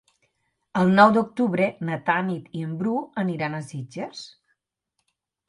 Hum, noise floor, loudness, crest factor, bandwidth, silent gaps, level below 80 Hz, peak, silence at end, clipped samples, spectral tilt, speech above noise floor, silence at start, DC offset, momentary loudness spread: none; -78 dBFS; -23 LUFS; 22 dB; 11 kHz; none; -66 dBFS; -2 dBFS; 1.2 s; under 0.1%; -7 dB/octave; 56 dB; 0.75 s; under 0.1%; 18 LU